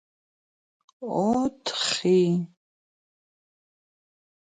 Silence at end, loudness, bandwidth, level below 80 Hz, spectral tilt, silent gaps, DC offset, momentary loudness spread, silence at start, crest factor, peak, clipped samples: 1.95 s; -24 LUFS; 9.4 kHz; -66 dBFS; -5 dB/octave; none; under 0.1%; 12 LU; 1 s; 18 dB; -12 dBFS; under 0.1%